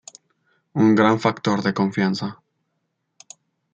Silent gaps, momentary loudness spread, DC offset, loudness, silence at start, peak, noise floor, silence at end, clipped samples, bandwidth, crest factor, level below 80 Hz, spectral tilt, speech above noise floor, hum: none; 13 LU; under 0.1%; -20 LUFS; 0.75 s; -2 dBFS; -75 dBFS; 1.4 s; under 0.1%; 8 kHz; 20 dB; -66 dBFS; -6.5 dB/octave; 55 dB; none